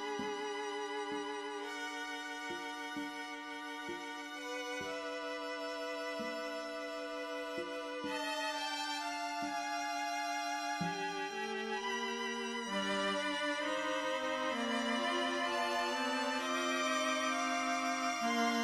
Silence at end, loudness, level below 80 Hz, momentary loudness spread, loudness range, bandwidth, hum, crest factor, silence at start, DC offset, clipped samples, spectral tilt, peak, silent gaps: 0 s; -37 LUFS; -76 dBFS; 8 LU; 7 LU; 15.5 kHz; none; 16 dB; 0 s; under 0.1%; under 0.1%; -2.5 dB/octave; -22 dBFS; none